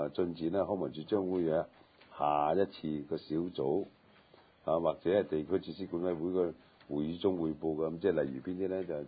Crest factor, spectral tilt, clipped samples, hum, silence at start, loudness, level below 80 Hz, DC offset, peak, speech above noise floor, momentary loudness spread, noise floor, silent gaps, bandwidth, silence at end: 18 dB; -6 dB/octave; under 0.1%; none; 0 s; -34 LUFS; -62 dBFS; under 0.1%; -16 dBFS; 29 dB; 7 LU; -62 dBFS; none; 4.8 kHz; 0 s